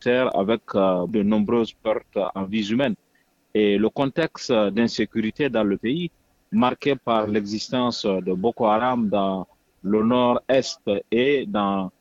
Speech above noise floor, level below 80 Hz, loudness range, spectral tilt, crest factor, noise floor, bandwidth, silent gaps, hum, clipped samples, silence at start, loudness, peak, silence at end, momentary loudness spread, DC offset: 43 dB; -56 dBFS; 2 LU; -6 dB/octave; 16 dB; -64 dBFS; 7.8 kHz; none; none; under 0.1%; 0 s; -22 LUFS; -6 dBFS; 0.1 s; 6 LU; under 0.1%